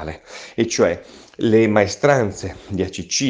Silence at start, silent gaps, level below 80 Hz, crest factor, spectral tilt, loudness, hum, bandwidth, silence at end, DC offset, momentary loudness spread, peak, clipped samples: 0 s; none; -50 dBFS; 18 dB; -4.5 dB/octave; -19 LUFS; none; 10 kHz; 0 s; under 0.1%; 16 LU; 0 dBFS; under 0.1%